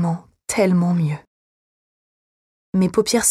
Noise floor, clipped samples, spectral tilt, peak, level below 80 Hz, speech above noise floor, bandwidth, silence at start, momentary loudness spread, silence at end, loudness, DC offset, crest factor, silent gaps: under -90 dBFS; under 0.1%; -5 dB/octave; -6 dBFS; -56 dBFS; over 73 dB; 14.5 kHz; 0 s; 9 LU; 0 s; -20 LUFS; under 0.1%; 16 dB; 1.27-2.73 s